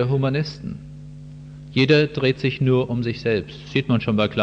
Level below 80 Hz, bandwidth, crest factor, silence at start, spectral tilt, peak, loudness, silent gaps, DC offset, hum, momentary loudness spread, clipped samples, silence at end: -48 dBFS; 7.6 kHz; 16 dB; 0 s; -7.5 dB/octave; -4 dBFS; -21 LUFS; none; under 0.1%; none; 22 LU; under 0.1%; 0 s